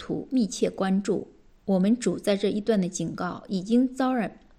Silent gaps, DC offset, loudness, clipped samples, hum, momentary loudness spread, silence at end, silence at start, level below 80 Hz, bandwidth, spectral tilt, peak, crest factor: none; under 0.1%; -26 LUFS; under 0.1%; none; 7 LU; 0.25 s; 0 s; -58 dBFS; 12.5 kHz; -6 dB/octave; -12 dBFS; 14 dB